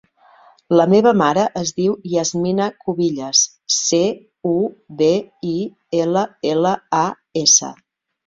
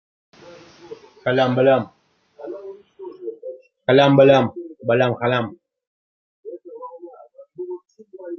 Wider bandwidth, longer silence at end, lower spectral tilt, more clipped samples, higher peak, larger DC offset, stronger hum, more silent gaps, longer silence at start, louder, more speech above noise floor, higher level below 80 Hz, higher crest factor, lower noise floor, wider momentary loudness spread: first, 7.8 kHz vs 6.8 kHz; first, 0.55 s vs 0 s; second, -3.5 dB/octave vs -7.5 dB/octave; neither; about the same, 0 dBFS vs -2 dBFS; neither; neither; second, none vs 5.87-6.43 s; second, 0.7 s vs 0.9 s; about the same, -17 LUFS vs -17 LUFS; first, 33 dB vs 29 dB; first, -60 dBFS vs -66 dBFS; about the same, 18 dB vs 20 dB; first, -50 dBFS vs -45 dBFS; second, 10 LU vs 25 LU